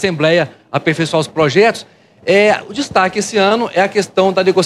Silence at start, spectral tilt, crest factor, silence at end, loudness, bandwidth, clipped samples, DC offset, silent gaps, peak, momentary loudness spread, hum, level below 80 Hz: 0 s; -4.5 dB/octave; 14 dB; 0 s; -14 LUFS; 12.5 kHz; under 0.1%; under 0.1%; none; 0 dBFS; 7 LU; none; -54 dBFS